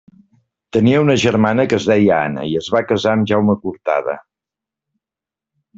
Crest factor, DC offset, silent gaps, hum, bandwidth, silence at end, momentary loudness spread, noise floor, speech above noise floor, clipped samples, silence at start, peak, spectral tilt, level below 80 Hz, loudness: 16 dB; under 0.1%; none; none; 7.8 kHz; 1.6 s; 8 LU; -88 dBFS; 73 dB; under 0.1%; 0.75 s; 0 dBFS; -6.5 dB/octave; -54 dBFS; -16 LUFS